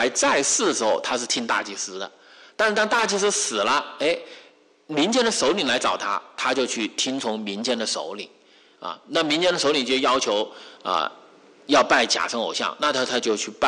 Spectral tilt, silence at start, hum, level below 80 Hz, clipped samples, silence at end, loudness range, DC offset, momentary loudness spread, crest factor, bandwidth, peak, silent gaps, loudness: -1.5 dB/octave; 0 s; none; -66 dBFS; under 0.1%; 0 s; 3 LU; under 0.1%; 11 LU; 16 dB; 11.5 kHz; -8 dBFS; none; -22 LUFS